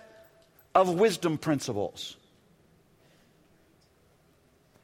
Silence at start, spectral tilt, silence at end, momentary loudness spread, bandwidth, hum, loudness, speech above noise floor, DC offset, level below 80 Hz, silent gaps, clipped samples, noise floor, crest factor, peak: 0.75 s; -5 dB/octave; 2.7 s; 14 LU; 16.5 kHz; none; -28 LUFS; 37 dB; under 0.1%; -68 dBFS; none; under 0.1%; -64 dBFS; 24 dB; -8 dBFS